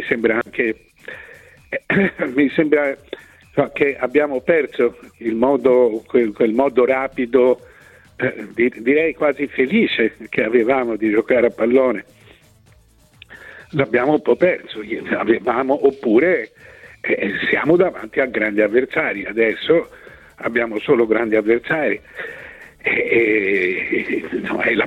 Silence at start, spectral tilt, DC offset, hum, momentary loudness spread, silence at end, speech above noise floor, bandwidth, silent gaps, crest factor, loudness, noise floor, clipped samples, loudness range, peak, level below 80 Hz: 0 s; -7.5 dB/octave; under 0.1%; none; 12 LU; 0 s; 34 dB; 9.2 kHz; none; 16 dB; -18 LUFS; -51 dBFS; under 0.1%; 3 LU; -2 dBFS; -54 dBFS